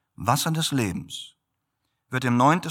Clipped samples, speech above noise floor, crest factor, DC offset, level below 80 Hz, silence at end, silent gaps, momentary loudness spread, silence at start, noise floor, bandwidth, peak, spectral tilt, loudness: under 0.1%; 55 dB; 20 dB; under 0.1%; -58 dBFS; 0 s; none; 17 LU; 0.2 s; -78 dBFS; 18 kHz; -6 dBFS; -4.5 dB/octave; -24 LUFS